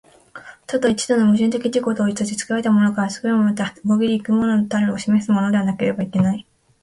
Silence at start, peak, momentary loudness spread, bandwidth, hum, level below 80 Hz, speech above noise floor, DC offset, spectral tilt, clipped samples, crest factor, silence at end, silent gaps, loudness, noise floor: 0.35 s; -6 dBFS; 6 LU; 11.5 kHz; none; -56 dBFS; 23 dB; under 0.1%; -6 dB/octave; under 0.1%; 14 dB; 0.4 s; none; -19 LUFS; -41 dBFS